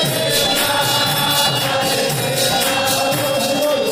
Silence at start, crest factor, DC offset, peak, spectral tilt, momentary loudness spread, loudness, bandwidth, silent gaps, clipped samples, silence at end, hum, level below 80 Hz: 0 s; 12 dB; under 0.1%; -4 dBFS; -2.5 dB/octave; 3 LU; -15 LUFS; 16.5 kHz; none; under 0.1%; 0 s; none; -50 dBFS